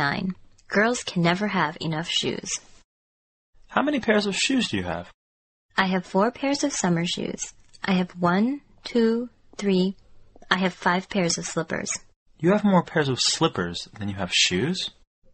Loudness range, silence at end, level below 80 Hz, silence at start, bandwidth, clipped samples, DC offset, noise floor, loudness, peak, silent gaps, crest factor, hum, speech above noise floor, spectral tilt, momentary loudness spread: 3 LU; 0.45 s; -56 dBFS; 0 s; 8.8 kHz; under 0.1%; under 0.1%; under -90 dBFS; -24 LUFS; 0 dBFS; 2.84-3.53 s, 5.14-5.69 s, 12.16-12.26 s; 24 dB; none; over 66 dB; -4 dB/octave; 11 LU